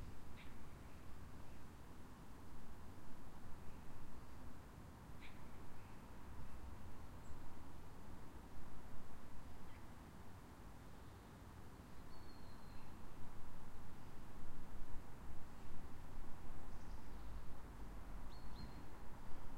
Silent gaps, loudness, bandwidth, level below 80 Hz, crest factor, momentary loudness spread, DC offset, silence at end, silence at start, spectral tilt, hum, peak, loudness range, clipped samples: none; -59 LUFS; 15 kHz; -56 dBFS; 14 dB; 3 LU; under 0.1%; 0 s; 0 s; -6 dB/octave; none; -30 dBFS; 2 LU; under 0.1%